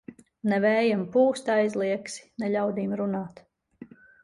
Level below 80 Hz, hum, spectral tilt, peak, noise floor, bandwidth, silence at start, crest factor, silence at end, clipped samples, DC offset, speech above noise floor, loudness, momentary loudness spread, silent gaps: -68 dBFS; none; -6 dB/octave; -10 dBFS; -49 dBFS; 11.5 kHz; 0.1 s; 16 dB; 0.4 s; under 0.1%; under 0.1%; 24 dB; -26 LUFS; 10 LU; none